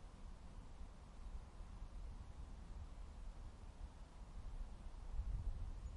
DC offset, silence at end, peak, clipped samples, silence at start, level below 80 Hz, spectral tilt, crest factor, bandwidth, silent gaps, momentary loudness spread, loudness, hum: under 0.1%; 0 s; -34 dBFS; under 0.1%; 0 s; -50 dBFS; -6.5 dB/octave; 16 dB; 11 kHz; none; 10 LU; -56 LUFS; none